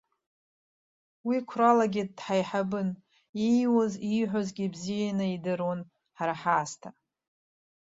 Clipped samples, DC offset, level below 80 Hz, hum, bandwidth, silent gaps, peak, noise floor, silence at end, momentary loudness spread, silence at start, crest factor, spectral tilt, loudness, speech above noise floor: under 0.1%; under 0.1%; -72 dBFS; none; 7.8 kHz; 3.29-3.33 s; -10 dBFS; under -90 dBFS; 1 s; 14 LU; 1.25 s; 20 dB; -6 dB/octave; -29 LUFS; over 62 dB